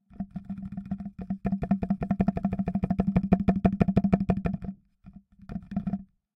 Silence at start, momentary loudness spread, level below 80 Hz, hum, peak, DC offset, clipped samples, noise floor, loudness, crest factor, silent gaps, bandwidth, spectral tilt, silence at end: 0.15 s; 14 LU; -42 dBFS; none; -6 dBFS; under 0.1%; under 0.1%; -52 dBFS; -29 LUFS; 22 dB; none; 5.4 kHz; -10.5 dB/octave; 0.3 s